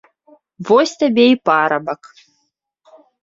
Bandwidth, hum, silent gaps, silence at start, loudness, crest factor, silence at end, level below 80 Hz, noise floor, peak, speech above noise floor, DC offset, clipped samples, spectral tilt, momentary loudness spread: 7.8 kHz; none; none; 0.6 s; -15 LUFS; 16 dB; 1.3 s; -66 dBFS; -69 dBFS; -2 dBFS; 55 dB; under 0.1%; under 0.1%; -4.5 dB/octave; 16 LU